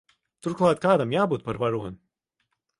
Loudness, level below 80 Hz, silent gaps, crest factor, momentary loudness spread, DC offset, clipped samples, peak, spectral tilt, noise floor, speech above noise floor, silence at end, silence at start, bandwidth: -24 LUFS; -58 dBFS; none; 18 dB; 12 LU; under 0.1%; under 0.1%; -8 dBFS; -7 dB/octave; -77 dBFS; 53 dB; 0.85 s; 0.45 s; 11.5 kHz